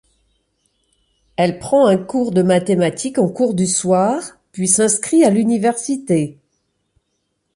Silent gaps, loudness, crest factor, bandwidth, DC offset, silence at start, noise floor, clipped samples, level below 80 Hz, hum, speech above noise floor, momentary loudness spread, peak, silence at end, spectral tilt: none; -16 LUFS; 18 dB; 11.5 kHz; under 0.1%; 1.4 s; -70 dBFS; under 0.1%; -56 dBFS; none; 55 dB; 8 LU; 0 dBFS; 1.25 s; -5 dB/octave